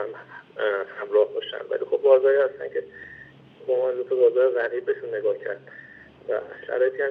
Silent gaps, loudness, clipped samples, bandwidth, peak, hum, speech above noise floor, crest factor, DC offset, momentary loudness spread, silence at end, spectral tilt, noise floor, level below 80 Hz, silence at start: none; -24 LUFS; under 0.1%; 4 kHz; -6 dBFS; none; 24 dB; 18 dB; under 0.1%; 22 LU; 0 s; -7 dB/octave; -47 dBFS; -72 dBFS; 0 s